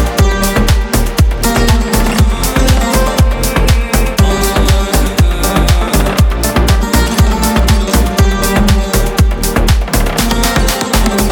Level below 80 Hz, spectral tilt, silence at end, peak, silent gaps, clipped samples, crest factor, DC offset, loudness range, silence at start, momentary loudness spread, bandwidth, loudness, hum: -12 dBFS; -4.5 dB/octave; 0 s; 0 dBFS; none; under 0.1%; 10 dB; under 0.1%; 0 LU; 0 s; 2 LU; 19.5 kHz; -12 LUFS; none